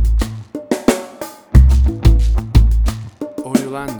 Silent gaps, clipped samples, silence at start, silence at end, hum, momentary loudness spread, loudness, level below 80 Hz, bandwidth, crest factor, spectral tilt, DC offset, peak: none; under 0.1%; 0 s; 0 s; none; 16 LU; -16 LUFS; -14 dBFS; 19.5 kHz; 14 dB; -7 dB/octave; under 0.1%; 0 dBFS